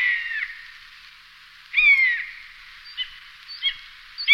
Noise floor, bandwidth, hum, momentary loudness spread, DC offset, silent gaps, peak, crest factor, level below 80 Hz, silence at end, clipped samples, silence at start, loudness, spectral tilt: -48 dBFS; 15.5 kHz; none; 27 LU; under 0.1%; none; -4 dBFS; 20 dB; -58 dBFS; 0 s; under 0.1%; 0 s; -21 LUFS; 2.5 dB/octave